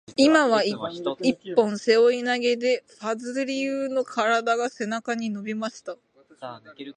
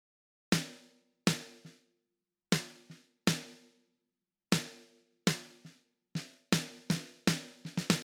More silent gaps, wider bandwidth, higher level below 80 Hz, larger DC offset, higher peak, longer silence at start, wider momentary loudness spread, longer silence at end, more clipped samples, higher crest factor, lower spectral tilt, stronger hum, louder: neither; second, 10 kHz vs 19.5 kHz; about the same, -74 dBFS vs -72 dBFS; neither; first, -6 dBFS vs -10 dBFS; second, 0.1 s vs 0.5 s; first, 20 LU vs 15 LU; about the same, 0.05 s vs 0 s; neither; second, 18 dB vs 28 dB; about the same, -4 dB/octave vs -4 dB/octave; neither; first, -24 LUFS vs -35 LUFS